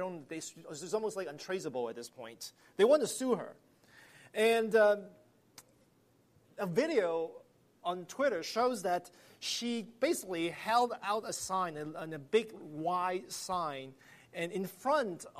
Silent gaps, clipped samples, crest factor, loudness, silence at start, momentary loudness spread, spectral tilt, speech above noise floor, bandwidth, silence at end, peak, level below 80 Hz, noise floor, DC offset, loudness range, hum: none; under 0.1%; 20 dB; -34 LUFS; 0 s; 16 LU; -3.5 dB/octave; 35 dB; 15 kHz; 0 s; -16 dBFS; -78 dBFS; -69 dBFS; under 0.1%; 5 LU; none